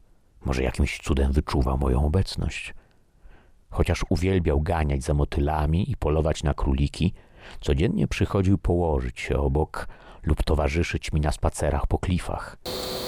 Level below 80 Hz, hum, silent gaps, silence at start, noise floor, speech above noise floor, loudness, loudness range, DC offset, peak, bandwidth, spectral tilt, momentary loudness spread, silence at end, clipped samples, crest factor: -30 dBFS; none; none; 0.45 s; -53 dBFS; 29 dB; -25 LUFS; 2 LU; under 0.1%; -6 dBFS; 15.5 kHz; -6.5 dB/octave; 8 LU; 0 s; under 0.1%; 18 dB